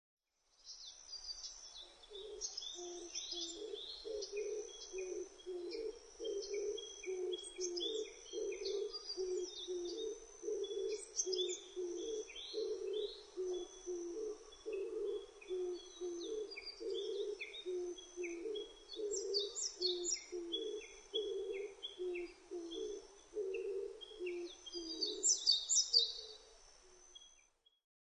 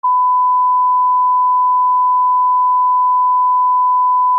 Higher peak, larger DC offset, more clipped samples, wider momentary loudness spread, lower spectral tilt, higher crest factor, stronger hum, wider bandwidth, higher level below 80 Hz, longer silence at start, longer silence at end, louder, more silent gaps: second, -18 dBFS vs -10 dBFS; neither; neither; first, 11 LU vs 0 LU; first, 0 dB/octave vs 10 dB/octave; first, 24 dB vs 4 dB; neither; first, 10 kHz vs 1.2 kHz; first, -74 dBFS vs under -90 dBFS; first, 0.6 s vs 0.05 s; first, 0.65 s vs 0 s; second, -42 LUFS vs -12 LUFS; neither